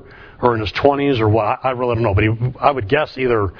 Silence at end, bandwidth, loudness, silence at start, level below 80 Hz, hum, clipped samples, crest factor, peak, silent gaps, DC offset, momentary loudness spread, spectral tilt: 0 s; 5.4 kHz; -17 LUFS; 0.05 s; -38 dBFS; none; under 0.1%; 18 dB; 0 dBFS; none; under 0.1%; 3 LU; -8.5 dB/octave